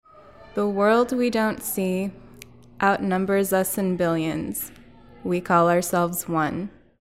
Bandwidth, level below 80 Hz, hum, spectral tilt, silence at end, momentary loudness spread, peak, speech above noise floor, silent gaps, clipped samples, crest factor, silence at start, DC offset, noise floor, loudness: 16 kHz; -56 dBFS; none; -5.5 dB/octave; 0.35 s; 12 LU; -6 dBFS; 26 dB; none; under 0.1%; 18 dB; 0.4 s; 0.2%; -48 dBFS; -23 LUFS